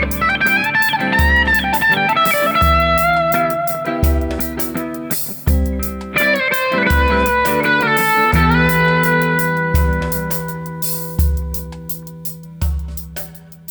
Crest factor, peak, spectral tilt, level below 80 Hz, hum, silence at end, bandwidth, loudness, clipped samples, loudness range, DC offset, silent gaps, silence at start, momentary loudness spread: 14 dB; -2 dBFS; -5 dB/octave; -24 dBFS; none; 0 s; over 20 kHz; -15 LUFS; under 0.1%; 7 LU; under 0.1%; none; 0 s; 13 LU